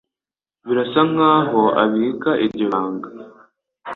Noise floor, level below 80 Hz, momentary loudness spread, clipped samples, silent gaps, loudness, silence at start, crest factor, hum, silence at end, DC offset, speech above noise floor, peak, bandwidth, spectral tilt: under -90 dBFS; -64 dBFS; 17 LU; under 0.1%; none; -18 LUFS; 0.65 s; 18 dB; none; 0 s; under 0.1%; over 73 dB; -2 dBFS; 4.3 kHz; -8.5 dB/octave